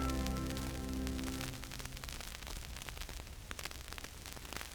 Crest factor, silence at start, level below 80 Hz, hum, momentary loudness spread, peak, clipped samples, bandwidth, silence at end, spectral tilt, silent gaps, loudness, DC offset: 24 dB; 0 s; -46 dBFS; none; 8 LU; -18 dBFS; under 0.1%; over 20 kHz; 0 s; -4 dB/octave; none; -43 LUFS; under 0.1%